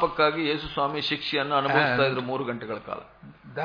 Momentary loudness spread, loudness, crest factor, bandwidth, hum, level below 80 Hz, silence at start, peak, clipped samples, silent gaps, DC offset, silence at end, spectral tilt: 13 LU; -25 LUFS; 20 dB; 5.2 kHz; none; -56 dBFS; 0 s; -6 dBFS; under 0.1%; none; under 0.1%; 0 s; -6.5 dB/octave